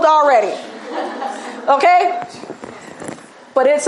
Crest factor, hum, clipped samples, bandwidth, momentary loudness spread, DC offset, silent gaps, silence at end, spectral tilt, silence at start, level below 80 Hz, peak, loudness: 16 dB; none; under 0.1%; 11.5 kHz; 21 LU; under 0.1%; none; 0 s; -2.5 dB/octave; 0 s; -72 dBFS; -2 dBFS; -16 LUFS